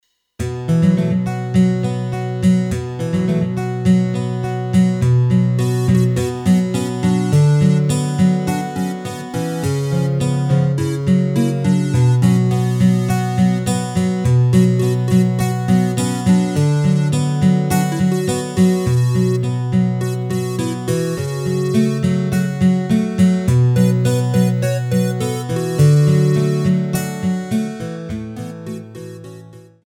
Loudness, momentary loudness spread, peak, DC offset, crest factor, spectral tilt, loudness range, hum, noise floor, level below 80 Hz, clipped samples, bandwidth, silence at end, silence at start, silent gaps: -17 LUFS; 8 LU; -2 dBFS; under 0.1%; 14 dB; -7 dB/octave; 3 LU; none; -39 dBFS; -44 dBFS; under 0.1%; 15 kHz; 0.25 s; 0.4 s; none